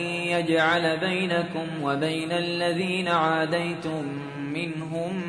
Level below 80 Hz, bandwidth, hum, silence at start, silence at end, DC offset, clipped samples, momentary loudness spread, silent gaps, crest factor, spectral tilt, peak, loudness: -66 dBFS; 10.5 kHz; none; 0 s; 0 s; under 0.1%; under 0.1%; 9 LU; none; 18 dB; -5.5 dB/octave; -8 dBFS; -26 LUFS